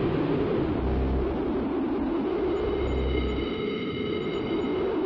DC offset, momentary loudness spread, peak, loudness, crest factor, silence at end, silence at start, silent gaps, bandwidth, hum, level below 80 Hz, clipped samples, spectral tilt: under 0.1%; 3 LU; -14 dBFS; -28 LUFS; 12 dB; 0 s; 0 s; none; 7.2 kHz; none; -36 dBFS; under 0.1%; -9 dB/octave